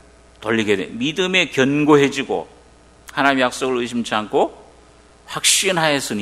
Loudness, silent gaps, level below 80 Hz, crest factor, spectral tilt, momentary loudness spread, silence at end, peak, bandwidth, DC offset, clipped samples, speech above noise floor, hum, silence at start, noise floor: -18 LUFS; none; -54 dBFS; 20 dB; -3 dB/octave; 10 LU; 0 s; 0 dBFS; 15.5 kHz; under 0.1%; under 0.1%; 30 dB; none; 0.4 s; -48 dBFS